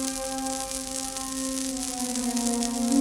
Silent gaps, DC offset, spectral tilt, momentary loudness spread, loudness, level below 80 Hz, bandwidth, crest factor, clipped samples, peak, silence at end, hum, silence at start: none; under 0.1%; -2 dB/octave; 4 LU; -28 LUFS; -50 dBFS; 19 kHz; 22 dB; under 0.1%; -6 dBFS; 0 s; none; 0 s